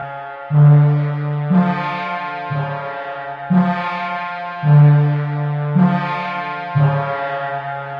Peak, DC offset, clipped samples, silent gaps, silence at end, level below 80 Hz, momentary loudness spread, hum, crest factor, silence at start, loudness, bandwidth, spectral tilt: -2 dBFS; under 0.1%; under 0.1%; none; 0 s; -62 dBFS; 14 LU; none; 14 dB; 0 s; -17 LUFS; 5 kHz; -10 dB/octave